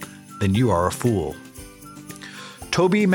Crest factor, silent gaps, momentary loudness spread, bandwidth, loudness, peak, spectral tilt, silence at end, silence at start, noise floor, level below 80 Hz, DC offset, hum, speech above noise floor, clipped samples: 16 dB; none; 21 LU; 18 kHz; -22 LUFS; -6 dBFS; -6 dB/octave; 0 s; 0 s; -41 dBFS; -48 dBFS; under 0.1%; none; 22 dB; under 0.1%